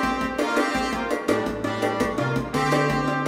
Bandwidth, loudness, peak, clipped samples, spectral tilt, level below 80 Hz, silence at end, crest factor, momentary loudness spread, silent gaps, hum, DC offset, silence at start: 16 kHz; -24 LUFS; -8 dBFS; under 0.1%; -5.5 dB/octave; -44 dBFS; 0 s; 16 dB; 4 LU; none; none; under 0.1%; 0 s